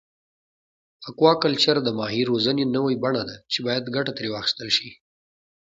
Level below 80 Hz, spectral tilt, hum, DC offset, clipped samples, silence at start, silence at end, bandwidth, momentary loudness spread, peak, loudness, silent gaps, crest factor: -64 dBFS; -5 dB/octave; none; under 0.1%; under 0.1%; 1 s; 0.65 s; 8 kHz; 8 LU; -4 dBFS; -22 LUFS; none; 22 dB